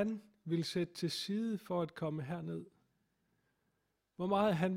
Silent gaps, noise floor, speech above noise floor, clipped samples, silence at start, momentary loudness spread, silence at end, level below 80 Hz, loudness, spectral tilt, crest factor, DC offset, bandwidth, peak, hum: none; -82 dBFS; 46 dB; under 0.1%; 0 s; 10 LU; 0 s; -74 dBFS; -38 LUFS; -6 dB/octave; 18 dB; under 0.1%; 16 kHz; -20 dBFS; none